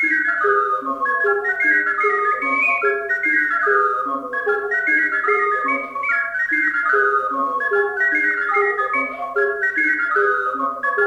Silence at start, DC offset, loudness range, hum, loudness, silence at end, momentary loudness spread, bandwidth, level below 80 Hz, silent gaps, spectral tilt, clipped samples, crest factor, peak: 0 s; under 0.1%; 1 LU; none; -18 LUFS; 0 s; 5 LU; 10.5 kHz; -62 dBFS; none; -4 dB/octave; under 0.1%; 14 dB; -6 dBFS